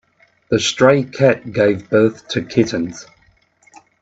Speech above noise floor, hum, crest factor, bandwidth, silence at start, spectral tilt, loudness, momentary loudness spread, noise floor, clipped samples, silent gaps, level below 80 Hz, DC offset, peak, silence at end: 40 dB; none; 18 dB; 8 kHz; 0.5 s; -5 dB/octave; -16 LUFS; 11 LU; -56 dBFS; under 0.1%; none; -56 dBFS; under 0.1%; 0 dBFS; 1 s